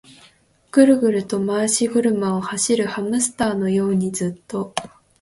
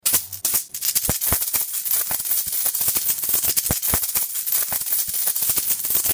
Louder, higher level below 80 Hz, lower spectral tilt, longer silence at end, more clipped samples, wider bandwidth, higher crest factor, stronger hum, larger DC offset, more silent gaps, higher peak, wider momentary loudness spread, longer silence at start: about the same, -20 LUFS vs -19 LUFS; second, -58 dBFS vs -46 dBFS; first, -4.5 dB/octave vs -0.5 dB/octave; first, 0.35 s vs 0 s; neither; second, 11.5 kHz vs over 20 kHz; about the same, 18 dB vs 22 dB; neither; neither; neither; about the same, -2 dBFS vs 0 dBFS; first, 11 LU vs 3 LU; first, 0.75 s vs 0.05 s